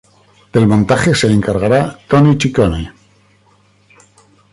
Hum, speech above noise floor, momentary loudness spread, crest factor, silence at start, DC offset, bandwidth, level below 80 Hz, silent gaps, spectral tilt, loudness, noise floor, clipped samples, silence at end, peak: 50 Hz at -35 dBFS; 40 dB; 6 LU; 14 dB; 0.55 s; under 0.1%; 11.5 kHz; -36 dBFS; none; -6.5 dB/octave; -13 LUFS; -52 dBFS; under 0.1%; 1.6 s; -2 dBFS